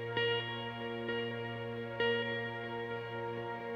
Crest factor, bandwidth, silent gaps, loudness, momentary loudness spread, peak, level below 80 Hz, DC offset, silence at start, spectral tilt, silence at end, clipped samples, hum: 18 dB; 6.8 kHz; none; -37 LUFS; 7 LU; -20 dBFS; -70 dBFS; under 0.1%; 0 s; -6.5 dB/octave; 0 s; under 0.1%; none